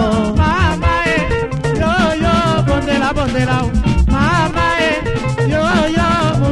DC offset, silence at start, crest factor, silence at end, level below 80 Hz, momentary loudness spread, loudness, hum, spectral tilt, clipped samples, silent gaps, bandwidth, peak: under 0.1%; 0 s; 14 dB; 0 s; -22 dBFS; 3 LU; -15 LUFS; none; -6 dB/octave; under 0.1%; none; 11.5 kHz; 0 dBFS